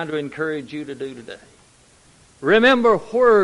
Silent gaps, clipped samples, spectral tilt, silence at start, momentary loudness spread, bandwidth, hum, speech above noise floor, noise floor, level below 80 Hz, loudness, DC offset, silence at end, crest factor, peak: none; under 0.1%; -5.5 dB/octave; 0 s; 18 LU; 11.5 kHz; none; 35 dB; -53 dBFS; -58 dBFS; -18 LUFS; under 0.1%; 0 s; 16 dB; -2 dBFS